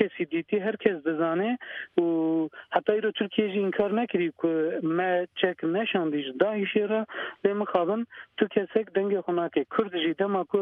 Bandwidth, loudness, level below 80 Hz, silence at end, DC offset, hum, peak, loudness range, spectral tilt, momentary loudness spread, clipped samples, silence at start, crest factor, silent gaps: 3.9 kHz; -27 LUFS; -72 dBFS; 0 s; under 0.1%; none; -6 dBFS; 1 LU; -8.5 dB/octave; 4 LU; under 0.1%; 0 s; 20 dB; none